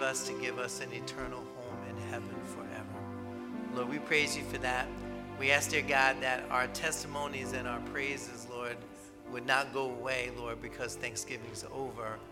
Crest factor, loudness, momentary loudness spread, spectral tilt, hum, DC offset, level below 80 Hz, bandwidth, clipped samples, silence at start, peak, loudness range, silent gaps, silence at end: 26 dB; -35 LUFS; 14 LU; -3 dB/octave; none; under 0.1%; -58 dBFS; 17 kHz; under 0.1%; 0 s; -10 dBFS; 9 LU; none; 0 s